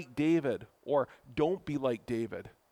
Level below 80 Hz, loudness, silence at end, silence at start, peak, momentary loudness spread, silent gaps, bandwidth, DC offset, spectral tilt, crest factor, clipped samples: -64 dBFS; -33 LUFS; 0.25 s; 0 s; -16 dBFS; 10 LU; none; 12 kHz; under 0.1%; -7.5 dB/octave; 16 dB; under 0.1%